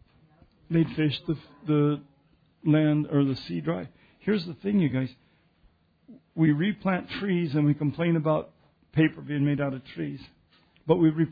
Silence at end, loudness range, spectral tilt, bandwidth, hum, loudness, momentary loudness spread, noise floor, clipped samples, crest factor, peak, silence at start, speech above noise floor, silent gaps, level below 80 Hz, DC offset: 0 s; 2 LU; -10 dB/octave; 5 kHz; none; -27 LUFS; 12 LU; -64 dBFS; under 0.1%; 18 dB; -8 dBFS; 0.7 s; 39 dB; none; -60 dBFS; under 0.1%